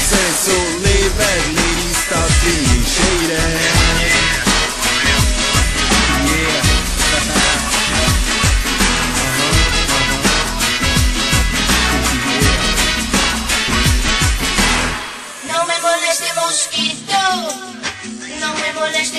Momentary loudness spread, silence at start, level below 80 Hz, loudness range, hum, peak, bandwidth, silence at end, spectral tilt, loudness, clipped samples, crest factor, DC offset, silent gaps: 5 LU; 0 s; -22 dBFS; 3 LU; none; 0 dBFS; 13 kHz; 0 s; -2.5 dB/octave; -14 LUFS; under 0.1%; 16 dB; under 0.1%; none